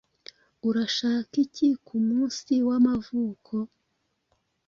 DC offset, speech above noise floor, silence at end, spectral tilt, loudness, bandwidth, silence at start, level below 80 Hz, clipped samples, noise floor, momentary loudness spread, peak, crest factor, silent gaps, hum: under 0.1%; 51 dB; 1 s; -5 dB/octave; -26 LUFS; 7.4 kHz; 0.65 s; -64 dBFS; under 0.1%; -76 dBFS; 10 LU; -10 dBFS; 16 dB; none; none